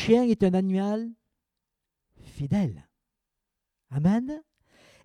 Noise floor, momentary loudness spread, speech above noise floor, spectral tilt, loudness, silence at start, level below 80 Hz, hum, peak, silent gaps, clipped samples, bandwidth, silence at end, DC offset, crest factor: -84 dBFS; 16 LU; 60 dB; -8 dB/octave; -26 LUFS; 0 s; -56 dBFS; none; -8 dBFS; none; under 0.1%; 10 kHz; 0.65 s; under 0.1%; 20 dB